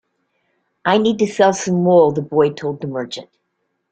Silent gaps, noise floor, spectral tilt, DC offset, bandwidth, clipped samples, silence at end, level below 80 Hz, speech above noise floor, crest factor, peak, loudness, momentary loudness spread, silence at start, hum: none; -71 dBFS; -5.5 dB/octave; under 0.1%; 9 kHz; under 0.1%; 0.65 s; -60 dBFS; 56 dB; 16 dB; -2 dBFS; -17 LUFS; 13 LU; 0.85 s; none